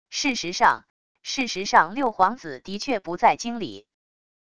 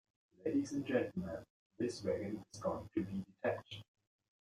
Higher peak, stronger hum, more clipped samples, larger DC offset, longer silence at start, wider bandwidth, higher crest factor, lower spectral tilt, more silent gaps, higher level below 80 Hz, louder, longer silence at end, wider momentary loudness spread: first, -2 dBFS vs -22 dBFS; neither; neither; first, 0.3% vs under 0.1%; second, 0.1 s vs 0.4 s; second, 11 kHz vs 13.5 kHz; about the same, 22 dB vs 20 dB; second, -2.5 dB/octave vs -6 dB/octave; about the same, 0.90-1.15 s vs 1.50-1.70 s; first, -60 dBFS vs -70 dBFS; first, -23 LUFS vs -41 LUFS; first, 0.8 s vs 0.6 s; first, 14 LU vs 9 LU